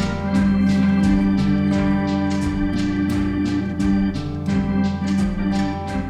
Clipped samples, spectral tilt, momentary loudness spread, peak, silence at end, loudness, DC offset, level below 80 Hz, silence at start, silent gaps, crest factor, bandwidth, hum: under 0.1%; -7.5 dB/octave; 5 LU; -8 dBFS; 0 s; -20 LUFS; under 0.1%; -34 dBFS; 0 s; none; 10 dB; 10 kHz; none